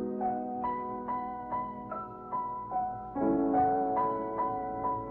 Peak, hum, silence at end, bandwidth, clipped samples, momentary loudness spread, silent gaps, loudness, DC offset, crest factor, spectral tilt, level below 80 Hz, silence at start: -18 dBFS; none; 0 s; 4 kHz; under 0.1%; 9 LU; none; -33 LUFS; under 0.1%; 14 dB; -11 dB/octave; -58 dBFS; 0 s